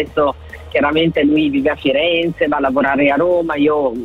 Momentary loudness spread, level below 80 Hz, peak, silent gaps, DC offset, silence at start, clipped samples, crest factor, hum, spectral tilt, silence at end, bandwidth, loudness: 4 LU; -40 dBFS; -4 dBFS; none; under 0.1%; 0 s; under 0.1%; 10 dB; none; -7.5 dB/octave; 0 s; 4.9 kHz; -15 LUFS